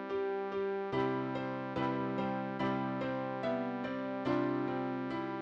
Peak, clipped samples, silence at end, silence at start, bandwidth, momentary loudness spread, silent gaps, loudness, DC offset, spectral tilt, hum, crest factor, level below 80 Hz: -20 dBFS; under 0.1%; 0 s; 0 s; 7.2 kHz; 4 LU; none; -36 LUFS; under 0.1%; -8 dB/octave; none; 14 dB; -68 dBFS